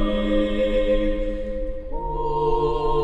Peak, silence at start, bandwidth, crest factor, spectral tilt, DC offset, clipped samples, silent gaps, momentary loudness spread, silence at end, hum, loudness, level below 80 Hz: -8 dBFS; 0 s; 7.6 kHz; 14 dB; -7.5 dB/octave; 0.4%; under 0.1%; none; 9 LU; 0 s; none; -24 LUFS; -28 dBFS